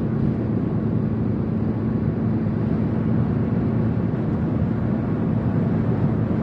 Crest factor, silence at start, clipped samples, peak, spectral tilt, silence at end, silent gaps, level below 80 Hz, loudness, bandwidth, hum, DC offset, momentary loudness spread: 12 dB; 0 s; under 0.1%; -10 dBFS; -11.5 dB/octave; 0 s; none; -40 dBFS; -22 LUFS; 5 kHz; none; under 0.1%; 2 LU